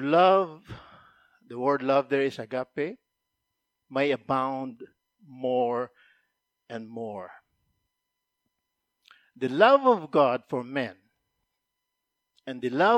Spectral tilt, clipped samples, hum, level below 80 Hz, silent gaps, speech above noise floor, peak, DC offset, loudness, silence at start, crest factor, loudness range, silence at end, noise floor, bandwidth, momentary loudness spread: -6.5 dB/octave; under 0.1%; none; -72 dBFS; none; 58 dB; -6 dBFS; under 0.1%; -26 LUFS; 0 s; 22 dB; 11 LU; 0 s; -83 dBFS; 8.8 kHz; 21 LU